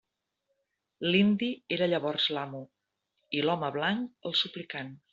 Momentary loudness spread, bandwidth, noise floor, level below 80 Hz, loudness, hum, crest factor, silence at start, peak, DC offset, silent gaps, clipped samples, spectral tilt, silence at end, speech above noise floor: 13 LU; 7.4 kHz; -81 dBFS; -72 dBFS; -29 LUFS; none; 20 dB; 1 s; -12 dBFS; under 0.1%; none; under 0.1%; -3 dB/octave; 0.15 s; 51 dB